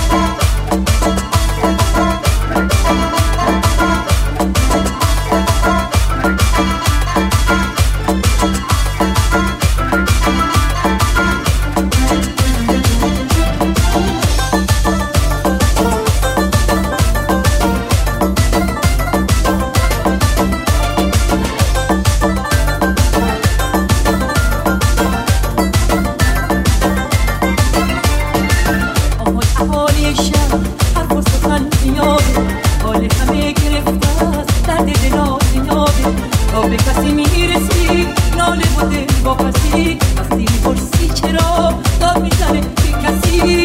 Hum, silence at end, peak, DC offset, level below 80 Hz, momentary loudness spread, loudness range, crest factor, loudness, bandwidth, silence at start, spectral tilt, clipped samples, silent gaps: none; 0 s; 0 dBFS; under 0.1%; -18 dBFS; 2 LU; 1 LU; 12 dB; -14 LUFS; 16.5 kHz; 0 s; -5 dB/octave; under 0.1%; none